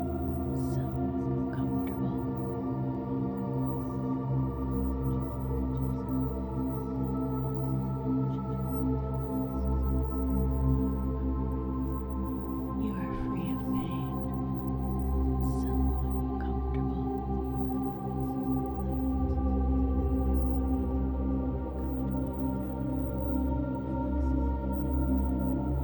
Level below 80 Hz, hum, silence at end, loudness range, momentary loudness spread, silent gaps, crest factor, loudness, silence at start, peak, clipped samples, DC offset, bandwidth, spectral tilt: -34 dBFS; none; 0 s; 2 LU; 4 LU; none; 14 dB; -32 LUFS; 0 s; -16 dBFS; under 0.1%; under 0.1%; over 20 kHz; -10.5 dB/octave